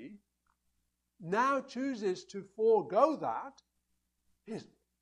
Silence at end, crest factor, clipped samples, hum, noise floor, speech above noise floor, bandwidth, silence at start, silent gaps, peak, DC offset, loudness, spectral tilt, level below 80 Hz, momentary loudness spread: 0.4 s; 22 dB; under 0.1%; 60 Hz at -70 dBFS; -81 dBFS; 49 dB; 10 kHz; 0 s; none; -12 dBFS; under 0.1%; -32 LUFS; -5.5 dB/octave; -80 dBFS; 17 LU